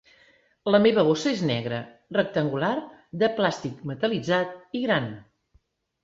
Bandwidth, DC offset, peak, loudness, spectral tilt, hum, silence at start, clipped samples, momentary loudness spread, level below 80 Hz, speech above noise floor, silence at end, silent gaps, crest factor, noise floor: 7.8 kHz; under 0.1%; -6 dBFS; -25 LUFS; -6 dB/octave; none; 0.65 s; under 0.1%; 13 LU; -64 dBFS; 41 dB; 0.8 s; none; 20 dB; -65 dBFS